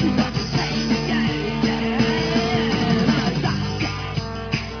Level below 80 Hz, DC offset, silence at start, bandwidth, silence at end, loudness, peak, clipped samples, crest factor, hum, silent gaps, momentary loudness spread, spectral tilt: -38 dBFS; under 0.1%; 0 s; 5.4 kHz; 0 s; -21 LUFS; -6 dBFS; under 0.1%; 16 dB; none; none; 7 LU; -5.5 dB/octave